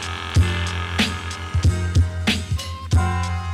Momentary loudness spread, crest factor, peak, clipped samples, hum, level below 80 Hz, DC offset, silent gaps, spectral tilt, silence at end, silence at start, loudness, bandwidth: 6 LU; 14 dB; -6 dBFS; under 0.1%; none; -32 dBFS; under 0.1%; none; -5 dB/octave; 0 s; 0 s; -22 LUFS; 13 kHz